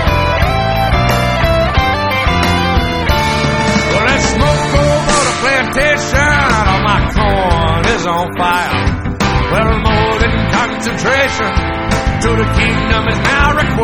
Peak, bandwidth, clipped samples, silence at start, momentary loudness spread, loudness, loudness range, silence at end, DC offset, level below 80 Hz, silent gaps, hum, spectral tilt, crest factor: 0 dBFS; 16 kHz; under 0.1%; 0 s; 3 LU; -12 LUFS; 2 LU; 0 s; under 0.1%; -20 dBFS; none; none; -5 dB/octave; 12 dB